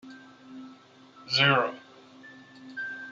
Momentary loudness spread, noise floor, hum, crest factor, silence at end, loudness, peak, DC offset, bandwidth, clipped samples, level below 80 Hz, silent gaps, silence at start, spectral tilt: 27 LU; -54 dBFS; none; 22 dB; 0 s; -25 LUFS; -10 dBFS; under 0.1%; 7.8 kHz; under 0.1%; -74 dBFS; none; 0.05 s; -4.5 dB/octave